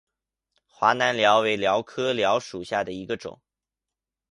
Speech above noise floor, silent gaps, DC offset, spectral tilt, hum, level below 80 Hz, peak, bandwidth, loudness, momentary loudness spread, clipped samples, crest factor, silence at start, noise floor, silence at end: 65 dB; none; under 0.1%; -3.5 dB/octave; none; -64 dBFS; -4 dBFS; 11.5 kHz; -23 LUFS; 13 LU; under 0.1%; 22 dB; 0.8 s; -88 dBFS; 0.95 s